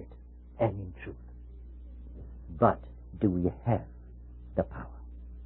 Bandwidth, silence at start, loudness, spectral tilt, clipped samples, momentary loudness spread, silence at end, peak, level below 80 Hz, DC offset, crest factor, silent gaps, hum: 4 kHz; 0 s; -31 LUFS; -12.5 dB/octave; under 0.1%; 22 LU; 0 s; -8 dBFS; -46 dBFS; under 0.1%; 26 dB; none; 60 Hz at -45 dBFS